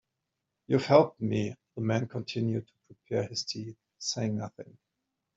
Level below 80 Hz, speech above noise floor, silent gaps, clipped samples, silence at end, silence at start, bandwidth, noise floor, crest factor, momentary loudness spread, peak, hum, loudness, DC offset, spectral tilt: -68 dBFS; 55 dB; none; under 0.1%; 0.7 s; 0.7 s; 8 kHz; -85 dBFS; 24 dB; 16 LU; -8 dBFS; none; -30 LUFS; under 0.1%; -5.5 dB/octave